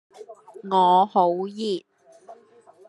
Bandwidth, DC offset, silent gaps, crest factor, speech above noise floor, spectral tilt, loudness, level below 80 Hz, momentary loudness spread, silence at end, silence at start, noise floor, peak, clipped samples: 11 kHz; under 0.1%; none; 18 dB; 32 dB; -6.5 dB/octave; -21 LUFS; -82 dBFS; 19 LU; 0.55 s; 0.2 s; -53 dBFS; -6 dBFS; under 0.1%